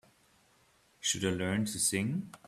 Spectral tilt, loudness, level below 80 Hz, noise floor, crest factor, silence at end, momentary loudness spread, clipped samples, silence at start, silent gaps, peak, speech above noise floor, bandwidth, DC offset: -3.5 dB/octave; -32 LUFS; -66 dBFS; -67 dBFS; 20 dB; 0.1 s; 5 LU; under 0.1%; 1 s; none; -16 dBFS; 34 dB; 16 kHz; under 0.1%